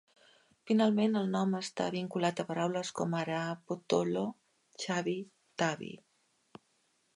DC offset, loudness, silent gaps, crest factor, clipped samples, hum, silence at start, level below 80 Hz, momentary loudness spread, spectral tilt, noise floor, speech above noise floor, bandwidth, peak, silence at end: under 0.1%; -33 LUFS; none; 20 dB; under 0.1%; none; 0.65 s; -80 dBFS; 12 LU; -5.5 dB/octave; -74 dBFS; 42 dB; 11.5 kHz; -14 dBFS; 1.2 s